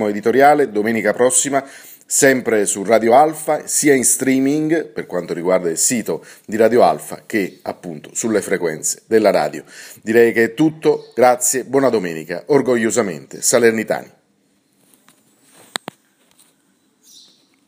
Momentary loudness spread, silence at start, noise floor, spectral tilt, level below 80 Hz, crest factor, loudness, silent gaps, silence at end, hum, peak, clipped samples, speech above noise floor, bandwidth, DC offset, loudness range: 13 LU; 0 s; -61 dBFS; -3.5 dB/octave; -66 dBFS; 18 dB; -16 LUFS; none; 3.65 s; none; 0 dBFS; under 0.1%; 44 dB; 16 kHz; under 0.1%; 7 LU